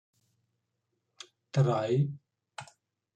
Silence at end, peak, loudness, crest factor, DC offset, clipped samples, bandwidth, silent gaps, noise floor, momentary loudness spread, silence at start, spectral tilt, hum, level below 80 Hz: 0.5 s; -14 dBFS; -29 LUFS; 20 dB; under 0.1%; under 0.1%; 8.8 kHz; none; -82 dBFS; 23 LU; 1.55 s; -7.5 dB/octave; none; -74 dBFS